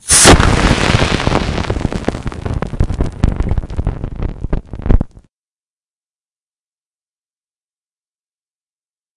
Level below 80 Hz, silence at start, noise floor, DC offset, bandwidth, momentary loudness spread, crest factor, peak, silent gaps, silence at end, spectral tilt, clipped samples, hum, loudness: -22 dBFS; 0.05 s; under -90 dBFS; under 0.1%; 12 kHz; 16 LU; 16 dB; 0 dBFS; none; 4.1 s; -3.5 dB/octave; 0.2%; none; -15 LUFS